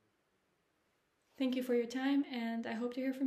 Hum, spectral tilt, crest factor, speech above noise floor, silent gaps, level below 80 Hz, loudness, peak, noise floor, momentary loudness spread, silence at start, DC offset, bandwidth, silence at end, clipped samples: none; -5 dB/octave; 14 dB; 43 dB; none; -86 dBFS; -37 LUFS; -24 dBFS; -79 dBFS; 5 LU; 1.4 s; under 0.1%; 15 kHz; 0 s; under 0.1%